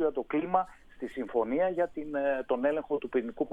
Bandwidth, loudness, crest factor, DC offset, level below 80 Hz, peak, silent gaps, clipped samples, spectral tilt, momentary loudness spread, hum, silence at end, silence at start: 8 kHz; -31 LUFS; 20 dB; under 0.1%; -60 dBFS; -12 dBFS; none; under 0.1%; -7.5 dB/octave; 9 LU; none; 0 s; 0 s